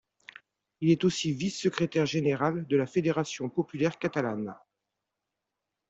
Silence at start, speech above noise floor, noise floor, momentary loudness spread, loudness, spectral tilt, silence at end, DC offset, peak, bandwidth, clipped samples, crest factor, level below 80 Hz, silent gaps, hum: 0.8 s; 58 dB; -86 dBFS; 7 LU; -29 LUFS; -6 dB/octave; 1.35 s; under 0.1%; -10 dBFS; 8.2 kHz; under 0.1%; 20 dB; -68 dBFS; none; none